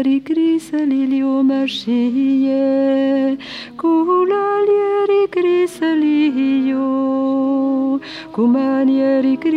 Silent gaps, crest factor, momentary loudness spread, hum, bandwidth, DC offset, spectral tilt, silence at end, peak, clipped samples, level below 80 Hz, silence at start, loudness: none; 10 dB; 4 LU; none; 10.5 kHz; under 0.1%; -6 dB/octave; 0 s; -6 dBFS; under 0.1%; -62 dBFS; 0 s; -16 LUFS